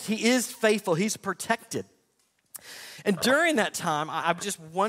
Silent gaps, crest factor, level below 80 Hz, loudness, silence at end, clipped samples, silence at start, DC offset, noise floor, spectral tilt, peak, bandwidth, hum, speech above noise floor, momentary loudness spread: none; 20 dB; -70 dBFS; -26 LUFS; 0 s; under 0.1%; 0 s; under 0.1%; -70 dBFS; -3.5 dB/octave; -6 dBFS; 16 kHz; none; 44 dB; 19 LU